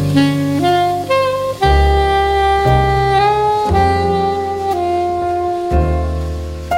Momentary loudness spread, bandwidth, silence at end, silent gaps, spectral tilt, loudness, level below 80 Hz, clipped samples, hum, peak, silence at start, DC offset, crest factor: 6 LU; 16 kHz; 0 s; none; -6.5 dB/octave; -15 LUFS; -22 dBFS; under 0.1%; none; -2 dBFS; 0 s; under 0.1%; 12 dB